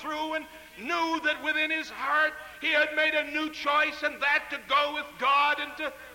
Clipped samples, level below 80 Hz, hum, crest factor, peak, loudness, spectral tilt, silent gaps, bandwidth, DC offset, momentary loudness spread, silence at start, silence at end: under 0.1%; -64 dBFS; none; 14 dB; -14 dBFS; -27 LUFS; -2 dB/octave; none; 17 kHz; under 0.1%; 8 LU; 0 s; 0 s